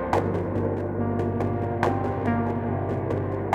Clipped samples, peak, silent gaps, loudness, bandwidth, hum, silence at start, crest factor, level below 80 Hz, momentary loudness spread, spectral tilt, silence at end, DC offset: under 0.1%; -6 dBFS; none; -26 LUFS; 9 kHz; none; 0 s; 18 dB; -46 dBFS; 3 LU; -9 dB/octave; 0 s; under 0.1%